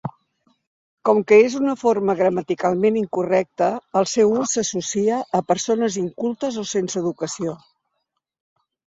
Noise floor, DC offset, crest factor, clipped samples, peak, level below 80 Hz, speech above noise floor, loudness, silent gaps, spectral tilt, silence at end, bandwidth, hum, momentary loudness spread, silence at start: -76 dBFS; under 0.1%; 18 dB; under 0.1%; -2 dBFS; -64 dBFS; 57 dB; -20 LUFS; 0.67-0.98 s; -4.5 dB/octave; 1.4 s; 7.8 kHz; none; 10 LU; 0.05 s